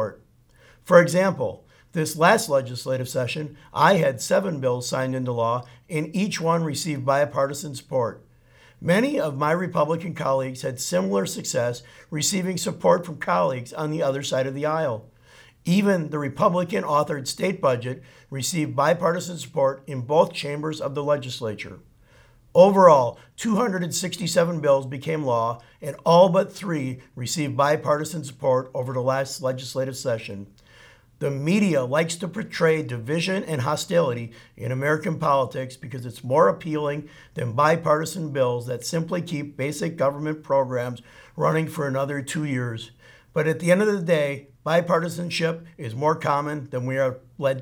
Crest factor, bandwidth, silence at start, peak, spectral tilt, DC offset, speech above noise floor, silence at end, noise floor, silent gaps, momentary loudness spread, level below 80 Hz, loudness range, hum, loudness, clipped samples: 22 dB; 19 kHz; 0 s; -2 dBFS; -5 dB/octave; under 0.1%; 32 dB; 0 s; -55 dBFS; none; 11 LU; -62 dBFS; 5 LU; none; -23 LUFS; under 0.1%